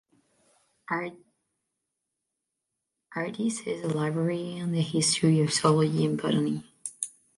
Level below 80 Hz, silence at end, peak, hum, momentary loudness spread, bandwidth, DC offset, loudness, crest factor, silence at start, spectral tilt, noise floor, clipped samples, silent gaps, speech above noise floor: -68 dBFS; 0.3 s; -8 dBFS; none; 12 LU; 11.5 kHz; under 0.1%; -27 LUFS; 22 dB; 0.9 s; -5 dB/octave; -84 dBFS; under 0.1%; none; 58 dB